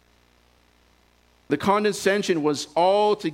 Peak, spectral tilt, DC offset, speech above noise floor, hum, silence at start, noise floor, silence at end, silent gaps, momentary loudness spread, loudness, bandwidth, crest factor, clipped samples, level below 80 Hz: -6 dBFS; -4.5 dB/octave; under 0.1%; 39 dB; none; 1.5 s; -60 dBFS; 0 s; none; 5 LU; -22 LUFS; 16 kHz; 18 dB; under 0.1%; -62 dBFS